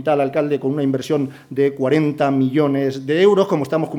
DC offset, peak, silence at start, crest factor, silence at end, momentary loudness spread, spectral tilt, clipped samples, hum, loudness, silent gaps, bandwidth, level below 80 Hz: under 0.1%; -4 dBFS; 0 s; 14 dB; 0 s; 6 LU; -7.5 dB/octave; under 0.1%; none; -18 LUFS; none; 14.5 kHz; -66 dBFS